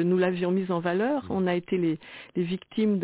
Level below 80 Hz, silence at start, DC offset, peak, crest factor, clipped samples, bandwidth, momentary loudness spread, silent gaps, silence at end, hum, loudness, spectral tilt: -60 dBFS; 0 s; under 0.1%; -12 dBFS; 14 dB; under 0.1%; 4 kHz; 6 LU; none; 0 s; none; -27 LUFS; -6.5 dB/octave